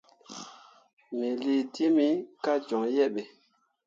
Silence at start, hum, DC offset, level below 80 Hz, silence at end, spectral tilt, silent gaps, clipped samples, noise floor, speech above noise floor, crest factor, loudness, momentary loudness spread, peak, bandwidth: 0.3 s; none; under 0.1%; -84 dBFS; 0.6 s; -5 dB/octave; 0.93-0.97 s; under 0.1%; -70 dBFS; 43 dB; 16 dB; -28 LUFS; 19 LU; -14 dBFS; 7.6 kHz